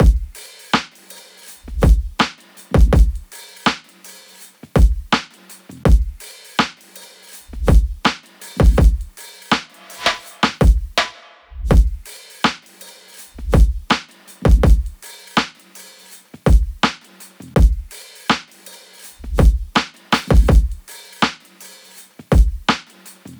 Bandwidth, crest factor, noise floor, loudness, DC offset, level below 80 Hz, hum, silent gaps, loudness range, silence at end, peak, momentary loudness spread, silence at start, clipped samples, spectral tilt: over 20 kHz; 16 dB; -43 dBFS; -18 LUFS; under 0.1%; -18 dBFS; none; none; 2 LU; 0.05 s; -2 dBFS; 23 LU; 0 s; under 0.1%; -5.5 dB/octave